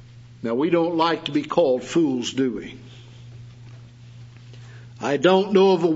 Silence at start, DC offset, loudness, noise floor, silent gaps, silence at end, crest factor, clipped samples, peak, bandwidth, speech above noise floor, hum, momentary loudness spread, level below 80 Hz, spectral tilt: 0.15 s; under 0.1%; -21 LUFS; -43 dBFS; none; 0 s; 18 dB; under 0.1%; -4 dBFS; 8 kHz; 23 dB; none; 25 LU; -60 dBFS; -6 dB/octave